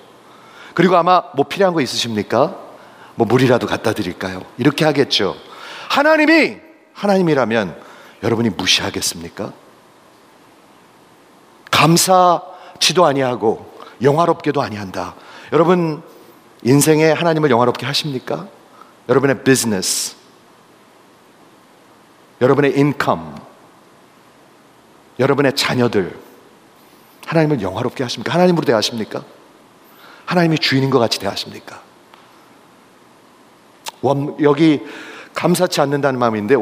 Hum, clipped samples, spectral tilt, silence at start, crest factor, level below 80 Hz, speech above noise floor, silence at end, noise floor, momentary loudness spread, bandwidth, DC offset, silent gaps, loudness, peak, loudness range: none; under 0.1%; -4.5 dB/octave; 0.6 s; 18 dB; -60 dBFS; 32 dB; 0 s; -48 dBFS; 17 LU; 16 kHz; under 0.1%; none; -16 LUFS; 0 dBFS; 5 LU